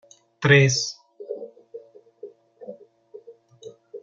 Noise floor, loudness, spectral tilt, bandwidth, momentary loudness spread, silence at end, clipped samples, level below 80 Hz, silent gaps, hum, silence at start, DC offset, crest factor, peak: -48 dBFS; -19 LUFS; -4.5 dB/octave; 7.6 kHz; 28 LU; 0.05 s; under 0.1%; -64 dBFS; none; none; 0.4 s; under 0.1%; 24 dB; -2 dBFS